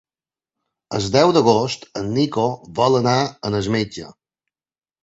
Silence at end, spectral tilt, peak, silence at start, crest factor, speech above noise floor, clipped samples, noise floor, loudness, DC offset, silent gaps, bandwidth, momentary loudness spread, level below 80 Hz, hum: 0.9 s; -5.5 dB/octave; -2 dBFS; 0.9 s; 18 dB; over 72 dB; under 0.1%; under -90 dBFS; -19 LUFS; under 0.1%; none; 8 kHz; 12 LU; -52 dBFS; none